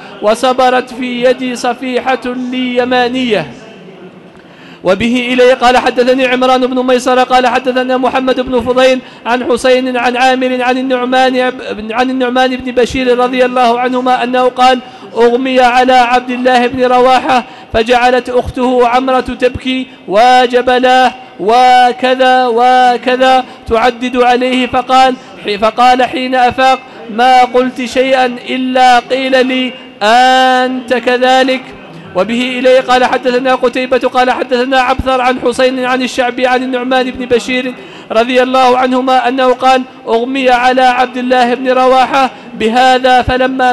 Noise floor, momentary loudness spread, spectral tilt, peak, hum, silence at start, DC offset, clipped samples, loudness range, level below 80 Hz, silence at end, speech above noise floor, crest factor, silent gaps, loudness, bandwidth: -35 dBFS; 8 LU; -4 dB/octave; -2 dBFS; none; 0 s; under 0.1%; under 0.1%; 3 LU; -38 dBFS; 0 s; 26 dB; 8 dB; none; -10 LUFS; 12 kHz